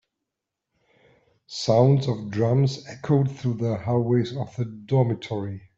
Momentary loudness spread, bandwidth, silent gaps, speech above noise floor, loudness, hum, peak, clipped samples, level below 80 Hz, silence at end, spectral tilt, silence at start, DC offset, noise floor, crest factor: 11 LU; 7.6 kHz; none; 61 dB; -24 LUFS; none; -6 dBFS; under 0.1%; -60 dBFS; 0.2 s; -7.5 dB/octave; 1.5 s; under 0.1%; -84 dBFS; 18 dB